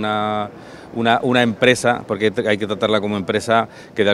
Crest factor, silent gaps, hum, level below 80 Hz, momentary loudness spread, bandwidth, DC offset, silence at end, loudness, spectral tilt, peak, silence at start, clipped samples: 18 dB; none; none; -56 dBFS; 11 LU; 13.5 kHz; under 0.1%; 0 s; -18 LUFS; -5 dB/octave; 0 dBFS; 0 s; under 0.1%